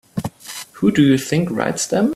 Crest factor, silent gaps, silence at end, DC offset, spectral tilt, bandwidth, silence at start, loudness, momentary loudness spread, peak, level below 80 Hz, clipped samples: 16 dB; none; 0 s; under 0.1%; -5.5 dB/octave; 14.5 kHz; 0.15 s; -18 LUFS; 15 LU; -2 dBFS; -52 dBFS; under 0.1%